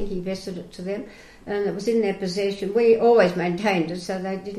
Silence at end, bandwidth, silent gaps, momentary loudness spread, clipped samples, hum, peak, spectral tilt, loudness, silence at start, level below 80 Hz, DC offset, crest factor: 0 s; 12.5 kHz; none; 16 LU; under 0.1%; none; -6 dBFS; -6 dB/octave; -23 LUFS; 0 s; -50 dBFS; under 0.1%; 16 dB